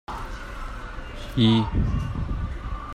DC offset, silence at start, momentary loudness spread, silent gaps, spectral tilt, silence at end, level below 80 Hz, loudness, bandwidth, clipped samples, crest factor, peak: under 0.1%; 0.1 s; 17 LU; none; -7 dB/octave; 0 s; -32 dBFS; -25 LUFS; 12 kHz; under 0.1%; 18 dB; -8 dBFS